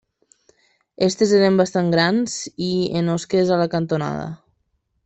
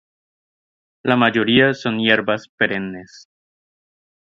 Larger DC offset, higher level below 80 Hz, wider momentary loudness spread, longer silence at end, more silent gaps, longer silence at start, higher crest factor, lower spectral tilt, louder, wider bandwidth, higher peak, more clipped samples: neither; about the same, -58 dBFS vs -58 dBFS; about the same, 10 LU vs 12 LU; second, 0.7 s vs 1.25 s; second, none vs 2.49-2.58 s; about the same, 1 s vs 1.05 s; about the same, 18 dB vs 20 dB; about the same, -5.5 dB/octave vs -6 dB/octave; about the same, -19 LUFS vs -17 LUFS; first, 8.4 kHz vs 7.4 kHz; second, -4 dBFS vs 0 dBFS; neither